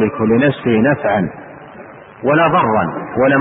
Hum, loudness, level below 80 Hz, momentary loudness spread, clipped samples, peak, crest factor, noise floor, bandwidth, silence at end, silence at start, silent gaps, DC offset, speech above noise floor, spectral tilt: none; -15 LUFS; -48 dBFS; 22 LU; under 0.1%; -2 dBFS; 12 dB; -36 dBFS; 4 kHz; 0 s; 0 s; none; under 0.1%; 22 dB; -12.5 dB/octave